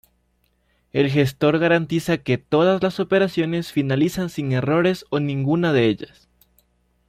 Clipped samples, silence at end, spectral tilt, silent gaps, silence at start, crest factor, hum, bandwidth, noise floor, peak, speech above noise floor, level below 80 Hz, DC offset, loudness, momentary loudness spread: under 0.1%; 1.05 s; -7 dB/octave; none; 0.95 s; 16 dB; 60 Hz at -45 dBFS; 15.5 kHz; -66 dBFS; -4 dBFS; 46 dB; -54 dBFS; under 0.1%; -20 LUFS; 5 LU